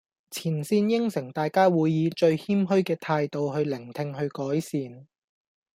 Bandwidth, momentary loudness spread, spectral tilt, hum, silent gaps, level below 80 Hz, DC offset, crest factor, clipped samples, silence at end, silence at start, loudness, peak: 16 kHz; 11 LU; -7 dB/octave; none; none; -70 dBFS; under 0.1%; 18 dB; under 0.1%; 0.7 s; 0.3 s; -26 LUFS; -8 dBFS